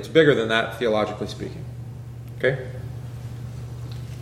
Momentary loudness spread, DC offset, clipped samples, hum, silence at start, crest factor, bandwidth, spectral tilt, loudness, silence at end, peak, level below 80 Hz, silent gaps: 18 LU; under 0.1%; under 0.1%; none; 0 s; 22 dB; 15 kHz; -6 dB/octave; -24 LUFS; 0 s; -2 dBFS; -46 dBFS; none